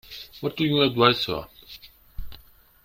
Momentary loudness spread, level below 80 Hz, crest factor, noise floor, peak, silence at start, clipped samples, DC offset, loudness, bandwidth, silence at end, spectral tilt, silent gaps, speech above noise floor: 25 LU; -48 dBFS; 24 dB; -51 dBFS; -2 dBFS; 0.1 s; under 0.1%; under 0.1%; -22 LUFS; 16.5 kHz; 0.5 s; -6 dB/octave; none; 29 dB